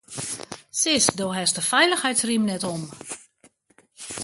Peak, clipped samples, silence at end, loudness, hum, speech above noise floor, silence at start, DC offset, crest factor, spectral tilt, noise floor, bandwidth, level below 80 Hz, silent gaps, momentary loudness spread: 0 dBFS; under 0.1%; 0 s; -22 LUFS; none; 38 dB; 0.1 s; under 0.1%; 24 dB; -2 dB/octave; -61 dBFS; 12 kHz; -62 dBFS; none; 18 LU